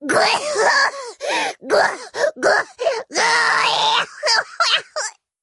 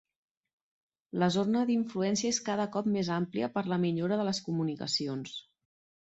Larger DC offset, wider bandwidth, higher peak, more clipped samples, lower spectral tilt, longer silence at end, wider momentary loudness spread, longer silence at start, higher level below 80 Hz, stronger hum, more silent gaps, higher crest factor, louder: neither; first, 11.5 kHz vs 8.2 kHz; first, -4 dBFS vs -16 dBFS; neither; second, -0.5 dB/octave vs -5 dB/octave; second, 0.35 s vs 0.7 s; about the same, 8 LU vs 6 LU; second, 0 s vs 1.15 s; about the same, -68 dBFS vs -72 dBFS; neither; neither; about the same, 16 dB vs 16 dB; first, -17 LUFS vs -31 LUFS